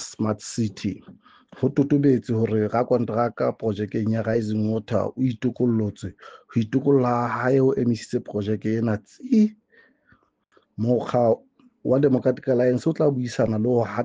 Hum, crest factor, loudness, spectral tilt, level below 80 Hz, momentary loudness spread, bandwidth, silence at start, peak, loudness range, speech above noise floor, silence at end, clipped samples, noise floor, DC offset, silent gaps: none; 16 dB; -23 LUFS; -7.5 dB/octave; -60 dBFS; 8 LU; 9.4 kHz; 0 s; -6 dBFS; 3 LU; 41 dB; 0 s; under 0.1%; -63 dBFS; under 0.1%; none